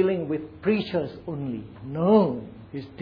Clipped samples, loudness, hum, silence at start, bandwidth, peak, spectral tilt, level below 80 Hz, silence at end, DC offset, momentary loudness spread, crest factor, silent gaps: under 0.1%; -26 LUFS; none; 0 s; 5.2 kHz; -6 dBFS; -10 dB/octave; -56 dBFS; 0 s; under 0.1%; 17 LU; 18 dB; none